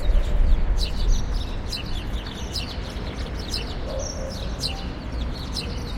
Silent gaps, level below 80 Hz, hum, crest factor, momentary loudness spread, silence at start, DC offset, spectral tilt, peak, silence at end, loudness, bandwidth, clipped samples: none; -24 dBFS; none; 16 dB; 7 LU; 0 s; under 0.1%; -4.5 dB/octave; -8 dBFS; 0 s; -29 LUFS; 15.5 kHz; under 0.1%